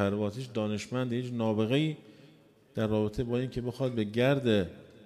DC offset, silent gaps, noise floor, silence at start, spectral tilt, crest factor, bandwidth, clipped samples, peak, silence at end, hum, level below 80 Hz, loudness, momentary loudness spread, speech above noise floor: under 0.1%; none; -59 dBFS; 0 s; -7 dB/octave; 16 dB; 13.5 kHz; under 0.1%; -14 dBFS; 0 s; none; -56 dBFS; -31 LUFS; 7 LU; 29 dB